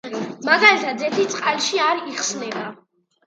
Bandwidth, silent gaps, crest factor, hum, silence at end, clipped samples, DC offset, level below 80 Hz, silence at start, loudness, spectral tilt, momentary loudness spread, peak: 9.6 kHz; none; 20 dB; none; 0.5 s; under 0.1%; under 0.1%; -74 dBFS; 0.05 s; -19 LUFS; -2 dB/octave; 16 LU; 0 dBFS